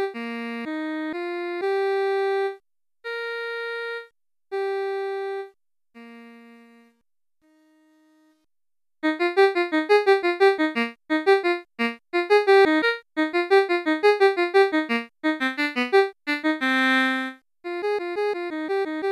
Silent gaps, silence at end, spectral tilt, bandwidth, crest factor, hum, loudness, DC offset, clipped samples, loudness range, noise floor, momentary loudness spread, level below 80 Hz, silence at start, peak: none; 0 s; -3.5 dB/octave; 12 kHz; 16 dB; none; -23 LUFS; under 0.1%; under 0.1%; 13 LU; under -90 dBFS; 12 LU; -78 dBFS; 0 s; -6 dBFS